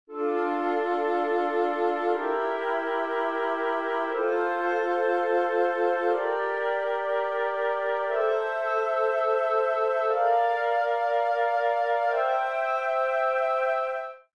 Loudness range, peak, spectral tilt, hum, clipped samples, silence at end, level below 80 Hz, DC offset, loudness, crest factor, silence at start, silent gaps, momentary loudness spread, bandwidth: 2 LU; -14 dBFS; -3 dB/octave; none; under 0.1%; 0.15 s; -82 dBFS; 0.1%; -26 LUFS; 12 dB; 0.1 s; none; 3 LU; 9.6 kHz